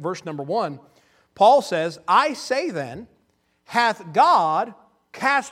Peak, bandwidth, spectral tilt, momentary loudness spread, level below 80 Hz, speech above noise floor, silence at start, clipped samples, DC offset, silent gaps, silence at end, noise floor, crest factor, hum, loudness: -4 dBFS; 15 kHz; -4 dB/octave; 15 LU; -68 dBFS; 46 dB; 0 s; under 0.1%; under 0.1%; none; 0 s; -66 dBFS; 18 dB; none; -21 LUFS